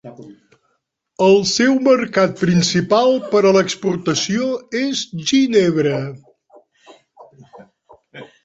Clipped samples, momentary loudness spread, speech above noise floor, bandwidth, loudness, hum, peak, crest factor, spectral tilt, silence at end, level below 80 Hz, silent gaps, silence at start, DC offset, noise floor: under 0.1%; 8 LU; 53 dB; 8 kHz; -16 LUFS; none; -2 dBFS; 16 dB; -4.5 dB/octave; 0.2 s; -58 dBFS; none; 0.05 s; under 0.1%; -69 dBFS